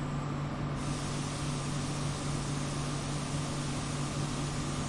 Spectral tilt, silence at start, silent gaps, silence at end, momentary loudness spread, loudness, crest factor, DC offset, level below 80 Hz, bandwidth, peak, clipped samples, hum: -5 dB/octave; 0 s; none; 0 s; 1 LU; -35 LUFS; 12 dB; under 0.1%; -46 dBFS; 11.5 kHz; -22 dBFS; under 0.1%; none